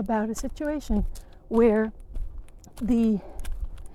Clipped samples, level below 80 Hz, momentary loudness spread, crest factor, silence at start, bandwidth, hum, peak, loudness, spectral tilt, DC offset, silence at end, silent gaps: under 0.1%; -36 dBFS; 19 LU; 18 dB; 0 s; 13.5 kHz; none; -10 dBFS; -26 LUFS; -7 dB/octave; under 0.1%; 0 s; none